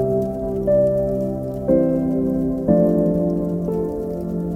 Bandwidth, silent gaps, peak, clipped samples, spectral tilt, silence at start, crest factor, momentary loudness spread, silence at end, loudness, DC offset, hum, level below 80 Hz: 14.5 kHz; none; -4 dBFS; under 0.1%; -11 dB/octave; 0 s; 16 dB; 8 LU; 0 s; -20 LUFS; under 0.1%; none; -38 dBFS